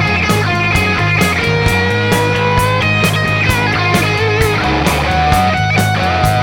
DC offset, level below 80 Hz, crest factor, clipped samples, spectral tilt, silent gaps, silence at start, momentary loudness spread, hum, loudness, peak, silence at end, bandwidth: under 0.1%; -28 dBFS; 12 dB; under 0.1%; -5 dB/octave; none; 0 s; 1 LU; none; -12 LUFS; 0 dBFS; 0 s; 18 kHz